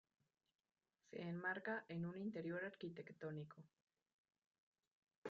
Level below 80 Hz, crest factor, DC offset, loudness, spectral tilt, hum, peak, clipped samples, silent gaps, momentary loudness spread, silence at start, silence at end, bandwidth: -90 dBFS; 20 dB; under 0.1%; -49 LUFS; -5.5 dB/octave; none; -32 dBFS; under 0.1%; 3.82-3.87 s, 4.13-4.25 s, 4.47-4.51 s, 4.58-4.72 s, 4.87-5.02 s, 5.17-5.22 s; 10 LU; 1.1 s; 0 s; 7.2 kHz